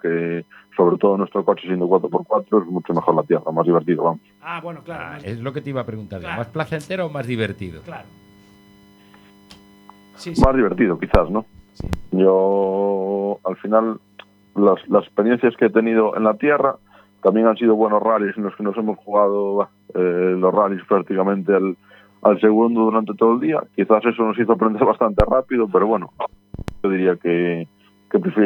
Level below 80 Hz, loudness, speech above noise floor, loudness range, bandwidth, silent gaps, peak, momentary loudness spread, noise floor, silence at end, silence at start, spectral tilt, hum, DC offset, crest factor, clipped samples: -36 dBFS; -19 LUFS; 31 dB; 9 LU; 19 kHz; none; 0 dBFS; 14 LU; -49 dBFS; 0 s; 0.05 s; -8.5 dB/octave; none; under 0.1%; 18 dB; under 0.1%